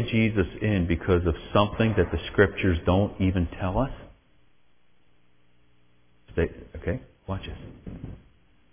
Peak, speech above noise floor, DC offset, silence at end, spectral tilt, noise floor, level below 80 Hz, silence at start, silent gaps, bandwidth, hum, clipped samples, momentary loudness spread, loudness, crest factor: -6 dBFS; 43 dB; under 0.1%; 0.55 s; -11 dB/octave; -68 dBFS; -38 dBFS; 0 s; none; 3.6 kHz; none; under 0.1%; 18 LU; -26 LUFS; 22 dB